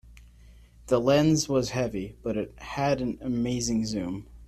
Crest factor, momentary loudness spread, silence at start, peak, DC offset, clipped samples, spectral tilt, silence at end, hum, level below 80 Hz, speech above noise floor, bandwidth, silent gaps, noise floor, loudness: 18 dB; 11 LU; 0.05 s; -10 dBFS; under 0.1%; under 0.1%; -5.5 dB/octave; 0 s; none; -50 dBFS; 26 dB; 14 kHz; none; -52 dBFS; -27 LUFS